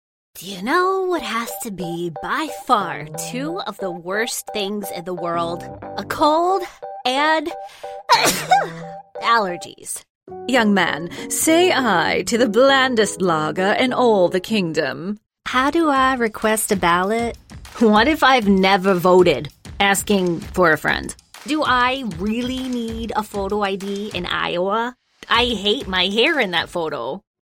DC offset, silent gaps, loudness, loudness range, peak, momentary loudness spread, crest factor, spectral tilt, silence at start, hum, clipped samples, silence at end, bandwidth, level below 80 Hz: under 0.1%; 10.10-10.21 s; -19 LUFS; 7 LU; -2 dBFS; 14 LU; 18 dB; -3.5 dB/octave; 0.35 s; none; under 0.1%; 0.2 s; 16.5 kHz; -46 dBFS